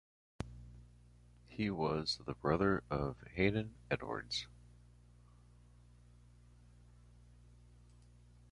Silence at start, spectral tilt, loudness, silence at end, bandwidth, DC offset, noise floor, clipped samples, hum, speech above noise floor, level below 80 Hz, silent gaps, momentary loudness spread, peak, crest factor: 0.4 s; -6 dB/octave; -38 LUFS; 4.05 s; 11 kHz; under 0.1%; -62 dBFS; under 0.1%; 60 Hz at -60 dBFS; 25 dB; -58 dBFS; none; 19 LU; -18 dBFS; 24 dB